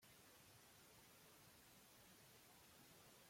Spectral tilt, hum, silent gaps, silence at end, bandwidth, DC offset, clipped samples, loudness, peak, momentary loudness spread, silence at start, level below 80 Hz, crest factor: -2.5 dB/octave; none; none; 0 s; 16.5 kHz; under 0.1%; under 0.1%; -66 LUFS; -56 dBFS; 1 LU; 0 s; -88 dBFS; 14 dB